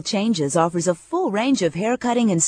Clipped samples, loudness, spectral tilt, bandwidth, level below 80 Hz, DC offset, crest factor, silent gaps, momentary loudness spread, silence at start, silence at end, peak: under 0.1%; -21 LUFS; -4.5 dB/octave; 10.5 kHz; -60 dBFS; under 0.1%; 16 dB; none; 3 LU; 0.05 s; 0 s; -4 dBFS